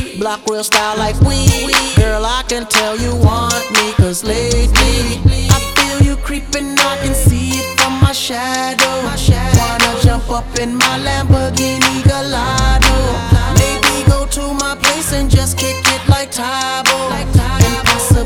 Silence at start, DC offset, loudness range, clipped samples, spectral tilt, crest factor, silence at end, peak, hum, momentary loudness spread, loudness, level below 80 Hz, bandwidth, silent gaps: 0 s; under 0.1%; 1 LU; under 0.1%; -4 dB/octave; 12 dB; 0 s; 0 dBFS; none; 6 LU; -13 LUFS; -20 dBFS; 19 kHz; none